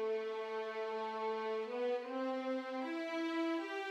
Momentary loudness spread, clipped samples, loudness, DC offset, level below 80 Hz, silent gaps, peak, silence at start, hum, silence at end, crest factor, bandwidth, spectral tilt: 3 LU; under 0.1%; -40 LUFS; under 0.1%; under -90 dBFS; none; -28 dBFS; 0 s; none; 0 s; 12 dB; 11 kHz; -4 dB/octave